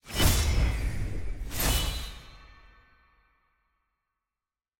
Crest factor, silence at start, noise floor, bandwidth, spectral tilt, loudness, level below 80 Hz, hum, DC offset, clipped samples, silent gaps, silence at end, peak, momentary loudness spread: 20 dB; 0.05 s; under -90 dBFS; 17 kHz; -3.5 dB/octave; -29 LUFS; -34 dBFS; none; under 0.1%; under 0.1%; none; 2.3 s; -10 dBFS; 14 LU